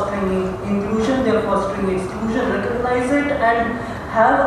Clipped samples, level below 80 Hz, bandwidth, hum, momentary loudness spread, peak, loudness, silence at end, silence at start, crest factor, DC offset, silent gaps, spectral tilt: under 0.1%; -38 dBFS; 13 kHz; none; 5 LU; -2 dBFS; -19 LUFS; 0 s; 0 s; 16 dB; under 0.1%; none; -6.5 dB/octave